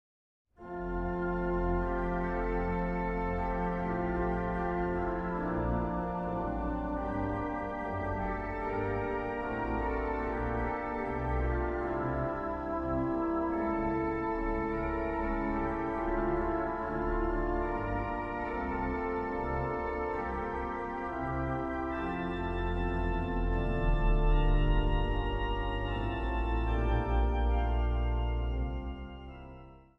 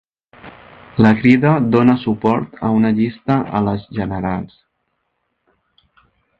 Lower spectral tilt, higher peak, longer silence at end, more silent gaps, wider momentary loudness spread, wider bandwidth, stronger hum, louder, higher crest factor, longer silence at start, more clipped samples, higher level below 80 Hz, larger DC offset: about the same, -9 dB/octave vs -9.5 dB/octave; second, -16 dBFS vs 0 dBFS; second, 0.15 s vs 1.95 s; neither; second, 4 LU vs 11 LU; about the same, 5.6 kHz vs 5.4 kHz; neither; second, -33 LUFS vs -16 LUFS; about the same, 16 dB vs 18 dB; first, 0.6 s vs 0.45 s; neither; first, -36 dBFS vs -46 dBFS; neither